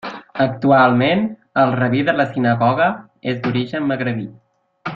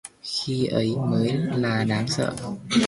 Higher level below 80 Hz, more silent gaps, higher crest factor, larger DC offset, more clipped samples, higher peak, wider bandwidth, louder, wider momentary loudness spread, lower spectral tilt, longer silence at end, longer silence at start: about the same, -56 dBFS vs -56 dBFS; neither; about the same, 16 dB vs 16 dB; neither; neither; first, -2 dBFS vs -8 dBFS; second, 6.8 kHz vs 11.5 kHz; first, -17 LUFS vs -25 LUFS; first, 13 LU vs 5 LU; first, -8.5 dB/octave vs -5.5 dB/octave; about the same, 0 s vs 0 s; about the same, 0.05 s vs 0.05 s